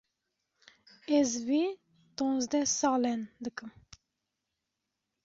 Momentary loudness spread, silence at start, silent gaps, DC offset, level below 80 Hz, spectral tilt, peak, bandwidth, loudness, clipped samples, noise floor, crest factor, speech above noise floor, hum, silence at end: 20 LU; 1.1 s; none; under 0.1%; -72 dBFS; -2.5 dB/octave; -16 dBFS; 7.8 kHz; -30 LUFS; under 0.1%; -85 dBFS; 18 dB; 56 dB; none; 1.55 s